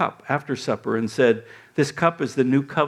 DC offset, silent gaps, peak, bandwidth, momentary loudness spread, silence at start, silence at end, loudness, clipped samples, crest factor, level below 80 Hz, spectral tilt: under 0.1%; none; -2 dBFS; 13 kHz; 7 LU; 0 s; 0 s; -23 LUFS; under 0.1%; 20 dB; -66 dBFS; -6 dB/octave